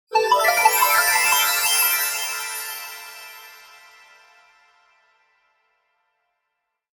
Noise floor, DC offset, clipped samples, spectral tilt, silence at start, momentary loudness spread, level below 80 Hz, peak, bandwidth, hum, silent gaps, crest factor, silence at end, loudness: -78 dBFS; under 0.1%; under 0.1%; 2.5 dB/octave; 0.1 s; 21 LU; -64 dBFS; -2 dBFS; 19 kHz; none; none; 20 dB; 3.35 s; -18 LUFS